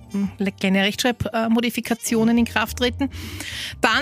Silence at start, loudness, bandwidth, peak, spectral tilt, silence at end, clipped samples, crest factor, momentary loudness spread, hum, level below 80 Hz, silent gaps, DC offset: 0 s; -22 LUFS; 15.5 kHz; -4 dBFS; -4 dB/octave; 0 s; under 0.1%; 18 dB; 9 LU; none; -44 dBFS; none; under 0.1%